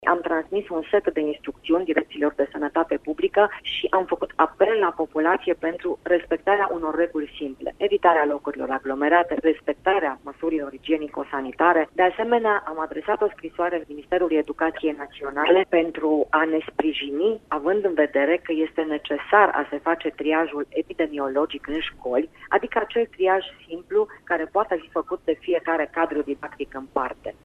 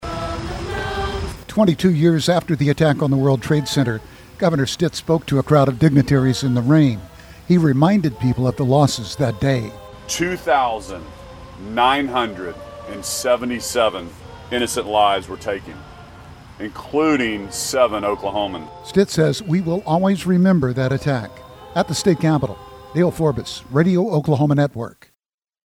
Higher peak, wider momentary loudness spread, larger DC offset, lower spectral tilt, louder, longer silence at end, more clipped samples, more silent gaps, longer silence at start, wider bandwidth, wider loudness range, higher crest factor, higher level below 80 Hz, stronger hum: about the same, -2 dBFS vs -2 dBFS; second, 9 LU vs 15 LU; neither; about the same, -6 dB/octave vs -6 dB/octave; second, -23 LUFS vs -19 LUFS; second, 0.15 s vs 0.8 s; neither; neither; about the same, 0 s vs 0 s; second, 4.3 kHz vs 16 kHz; about the same, 3 LU vs 5 LU; about the same, 22 dB vs 18 dB; second, -56 dBFS vs -42 dBFS; neither